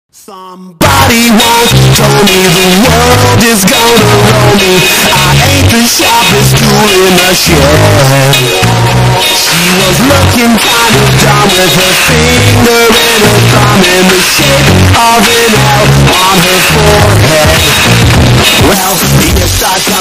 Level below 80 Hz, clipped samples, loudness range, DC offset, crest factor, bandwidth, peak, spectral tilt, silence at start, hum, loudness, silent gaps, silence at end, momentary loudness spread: -22 dBFS; 0.3%; 1 LU; under 0.1%; 4 dB; 16.5 kHz; 0 dBFS; -3.5 dB/octave; 0.3 s; none; -4 LUFS; none; 0 s; 2 LU